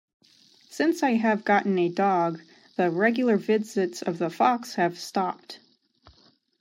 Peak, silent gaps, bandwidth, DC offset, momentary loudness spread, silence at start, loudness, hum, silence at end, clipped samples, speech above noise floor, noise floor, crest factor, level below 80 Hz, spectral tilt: -8 dBFS; none; 16 kHz; under 0.1%; 14 LU; 0.7 s; -25 LUFS; none; 1.05 s; under 0.1%; 37 dB; -61 dBFS; 18 dB; -74 dBFS; -5.5 dB/octave